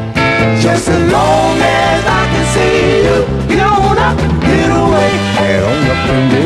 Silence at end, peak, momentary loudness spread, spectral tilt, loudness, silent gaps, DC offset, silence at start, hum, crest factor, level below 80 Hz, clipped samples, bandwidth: 0 s; 0 dBFS; 2 LU; -5.5 dB/octave; -11 LUFS; none; under 0.1%; 0 s; none; 10 dB; -24 dBFS; under 0.1%; 13.5 kHz